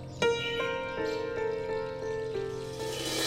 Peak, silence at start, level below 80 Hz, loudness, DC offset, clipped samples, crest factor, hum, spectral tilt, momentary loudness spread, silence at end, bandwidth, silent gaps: -14 dBFS; 0 s; -54 dBFS; -33 LUFS; under 0.1%; under 0.1%; 18 dB; none; -3.5 dB/octave; 6 LU; 0 s; 16 kHz; none